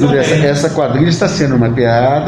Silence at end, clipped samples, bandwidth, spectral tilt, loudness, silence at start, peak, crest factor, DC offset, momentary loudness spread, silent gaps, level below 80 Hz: 0 s; under 0.1%; 11 kHz; -6 dB/octave; -12 LUFS; 0 s; 0 dBFS; 10 dB; under 0.1%; 2 LU; none; -38 dBFS